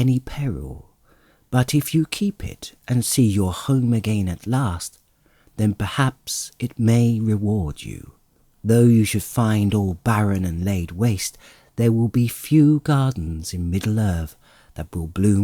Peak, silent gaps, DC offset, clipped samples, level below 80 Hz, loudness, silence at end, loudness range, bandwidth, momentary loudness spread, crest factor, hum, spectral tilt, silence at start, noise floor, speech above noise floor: -6 dBFS; none; under 0.1%; under 0.1%; -44 dBFS; -21 LUFS; 0 s; 3 LU; 19 kHz; 16 LU; 16 dB; none; -6 dB/octave; 0 s; -58 dBFS; 38 dB